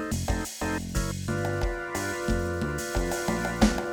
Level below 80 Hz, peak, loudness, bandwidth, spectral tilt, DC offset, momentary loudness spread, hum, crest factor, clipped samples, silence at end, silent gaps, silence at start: -36 dBFS; -6 dBFS; -29 LUFS; over 20 kHz; -5 dB/octave; under 0.1%; 6 LU; none; 22 dB; under 0.1%; 0 s; none; 0 s